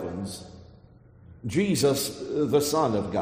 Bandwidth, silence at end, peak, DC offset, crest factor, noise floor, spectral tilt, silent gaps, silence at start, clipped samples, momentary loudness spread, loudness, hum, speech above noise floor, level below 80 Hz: 15.5 kHz; 0 s; -10 dBFS; under 0.1%; 18 dB; -52 dBFS; -5 dB/octave; none; 0 s; under 0.1%; 16 LU; -26 LUFS; none; 28 dB; -56 dBFS